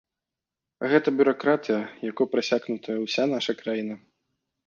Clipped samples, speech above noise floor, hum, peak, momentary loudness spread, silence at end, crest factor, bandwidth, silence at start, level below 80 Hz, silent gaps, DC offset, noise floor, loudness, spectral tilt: under 0.1%; 63 dB; none; -6 dBFS; 10 LU; 0.7 s; 20 dB; 7.2 kHz; 0.8 s; -74 dBFS; none; under 0.1%; -88 dBFS; -25 LUFS; -5 dB/octave